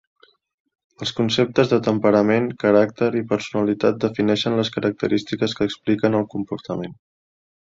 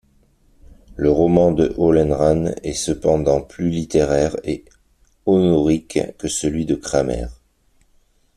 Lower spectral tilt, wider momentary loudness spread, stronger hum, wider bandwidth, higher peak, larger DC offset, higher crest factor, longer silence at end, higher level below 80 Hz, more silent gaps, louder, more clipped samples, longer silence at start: about the same, -6 dB/octave vs -6 dB/octave; about the same, 11 LU vs 11 LU; neither; second, 7.8 kHz vs 13.5 kHz; about the same, -2 dBFS vs 0 dBFS; neither; about the same, 18 dB vs 18 dB; second, 0.8 s vs 1.05 s; second, -58 dBFS vs -38 dBFS; neither; second, -21 LUFS vs -18 LUFS; neither; first, 1 s vs 0.65 s